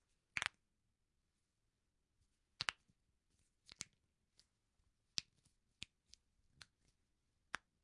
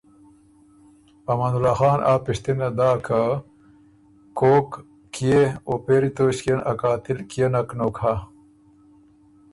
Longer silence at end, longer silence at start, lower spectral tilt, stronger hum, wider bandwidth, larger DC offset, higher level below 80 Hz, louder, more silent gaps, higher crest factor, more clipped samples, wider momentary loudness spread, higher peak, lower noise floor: second, 0.25 s vs 1.3 s; second, 0.35 s vs 1.3 s; second, 0 dB/octave vs -7 dB/octave; neither; about the same, 11 kHz vs 11.5 kHz; neither; second, -82 dBFS vs -50 dBFS; second, -48 LUFS vs -22 LUFS; neither; first, 38 dB vs 18 dB; neither; first, 23 LU vs 11 LU; second, -16 dBFS vs -6 dBFS; first, -87 dBFS vs -53 dBFS